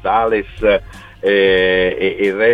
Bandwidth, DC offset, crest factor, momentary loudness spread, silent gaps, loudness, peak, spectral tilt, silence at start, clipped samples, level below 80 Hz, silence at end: 8.4 kHz; 0.2%; 12 dB; 6 LU; none; -15 LUFS; -2 dBFS; -6 dB/octave; 0.05 s; under 0.1%; -38 dBFS; 0 s